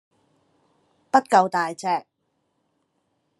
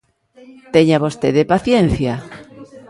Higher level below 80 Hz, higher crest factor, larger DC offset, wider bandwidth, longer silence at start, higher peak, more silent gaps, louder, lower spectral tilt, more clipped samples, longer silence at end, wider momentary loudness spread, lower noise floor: second, -82 dBFS vs -38 dBFS; first, 24 dB vs 16 dB; neither; about the same, 12 kHz vs 11.5 kHz; first, 1.15 s vs 0.75 s; about the same, -2 dBFS vs 0 dBFS; neither; second, -22 LUFS vs -15 LUFS; second, -4.5 dB/octave vs -7 dB/octave; neither; first, 1.4 s vs 0.1 s; second, 9 LU vs 15 LU; first, -73 dBFS vs -46 dBFS